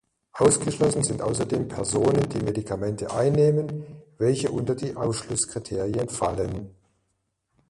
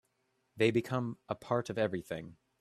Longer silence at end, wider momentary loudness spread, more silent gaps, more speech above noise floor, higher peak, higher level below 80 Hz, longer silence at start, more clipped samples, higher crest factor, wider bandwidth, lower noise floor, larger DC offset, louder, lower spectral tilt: first, 1 s vs 0.3 s; second, 10 LU vs 13 LU; neither; first, 51 dB vs 44 dB; first, -6 dBFS vs -14 dBFS; first, -50 dBFS vs -70 dBFS; second, 0.35 s vs 0.55 s; neither; about the same, 20 dB vs 22 dB; second, 11.5 kHz vs 13.5 kHz; about the same, -75 dBFS vs -78 dBFS; neither; first, -25 LUFS vs -34 LUFS; about the same, -5.5 dB/octave vs -6.5 dB/octave